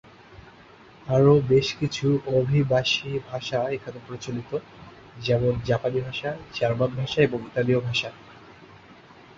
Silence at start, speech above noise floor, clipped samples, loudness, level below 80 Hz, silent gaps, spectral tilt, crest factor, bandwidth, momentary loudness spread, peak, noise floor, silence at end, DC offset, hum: 0.3 s; 26 dB; under 0.1%; -24 LUFS; -52 dBFS; none; -6.5 dB/octave; 20 dB; 7.6 kHz; 13 LU; -6 dBFS; -50 dBFS; 0.45 s; under 0.1%; none